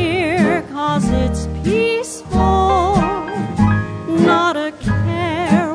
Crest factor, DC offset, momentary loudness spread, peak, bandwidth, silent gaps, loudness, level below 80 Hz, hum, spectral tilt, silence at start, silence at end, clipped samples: 14 dB; under 0.1%; 7 LU; -2 dBFS; 11 kHz; none; -17 LUFS; -28 dBFS; none; -6.5 dB/octave; 0 s; 0 s; under 0.1%